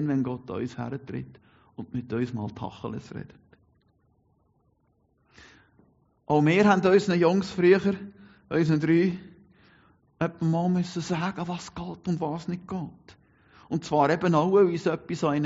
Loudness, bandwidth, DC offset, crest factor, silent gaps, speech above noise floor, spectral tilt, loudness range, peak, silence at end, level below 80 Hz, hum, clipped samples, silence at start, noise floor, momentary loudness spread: -26 LUFS; 8 kHz; under 0.1%; 20 dB; none; 43 dB; -6.5 dB/octave; 14 LU; -8 dBFS; 0 s; -62 dBFS; none; under 0.1%; 0 s; -68 dBFS; 17 LU